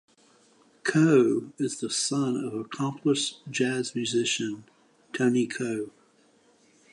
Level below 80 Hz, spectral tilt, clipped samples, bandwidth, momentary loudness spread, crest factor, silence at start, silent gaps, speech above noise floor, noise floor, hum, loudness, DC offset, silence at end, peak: -76 dBFS; -4.5 dB/octave; under 0.1%; 11 kHz; 12 LU; 18 dB; 0.85 s; none; 36 dB; -62 dBFS; none; -27 LUFS; under 0.1%; 1.05 s; -10 dBFS